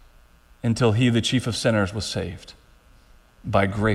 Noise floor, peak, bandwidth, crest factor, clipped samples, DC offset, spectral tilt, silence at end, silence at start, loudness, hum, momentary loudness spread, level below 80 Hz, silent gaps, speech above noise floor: -53 dBFS; -6 dBFS; 13 kHz; 18 dB; under 0.1%; under 0.1%; -5.5 dB/octave; 0 s; 0.65 s; -23 LUFS; none; 13 LU; -46 dBFS; none; 31 dB